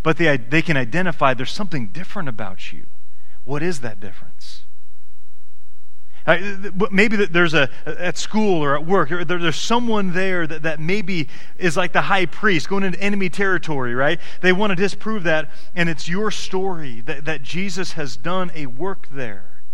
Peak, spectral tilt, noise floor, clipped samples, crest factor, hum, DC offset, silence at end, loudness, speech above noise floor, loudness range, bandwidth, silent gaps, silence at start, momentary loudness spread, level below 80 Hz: 0 dBFS; -5 dB/octave; -57 dBFS; under 0.1%; 22 dB; none; 20%; 0 s; -21 LUFS; 36 dB; 11 LU; 13.5 kHz; none; 0 s; 13 LU; -48 dBFS